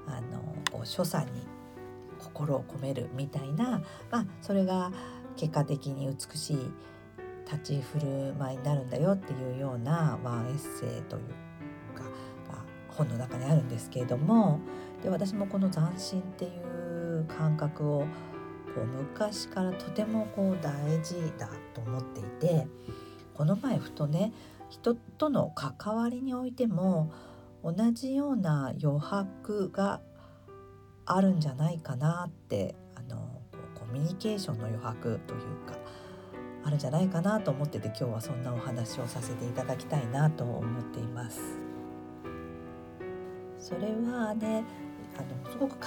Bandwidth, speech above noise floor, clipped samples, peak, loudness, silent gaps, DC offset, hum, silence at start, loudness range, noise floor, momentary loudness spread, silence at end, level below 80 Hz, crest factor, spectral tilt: 18.5 kHz; 21 dB; under 0.1%; -10 dBFS; -33 LUFS; none; under 0.1%; none; 0 s; 5 LU; -52 dBFS; 15 LU; 0 s; -64 dBFS; 24 dB; -7 dB/octave